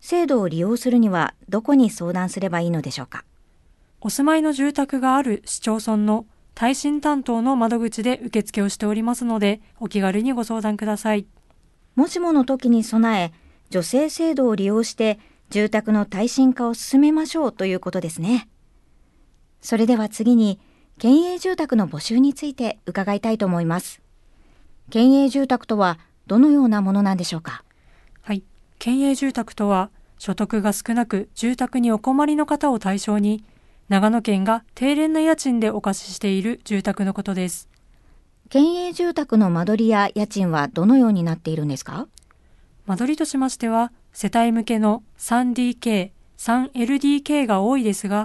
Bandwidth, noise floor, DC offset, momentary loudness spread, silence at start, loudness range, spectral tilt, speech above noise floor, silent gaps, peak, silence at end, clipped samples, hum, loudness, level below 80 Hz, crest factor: 12.5 kHz; -56 dBFS; under 0.1%; 10 LU; 0.05 s; 4 LU; -5.5 dB/octave; 36 dB; none; -4 dBFS; 0 s; under 0.1%; none; -21 LUFS; -54 dBFS; 16 dB